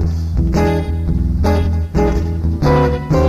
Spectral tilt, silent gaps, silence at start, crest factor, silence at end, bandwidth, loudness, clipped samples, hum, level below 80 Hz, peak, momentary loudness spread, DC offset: -8 dB/octave; none; 0 s; 12 dB; 0 s; 13 kHz; -16 LUFS; under 0.1%; none; -20 dBFS; -2 dBFS; 5 LU; under 0.1%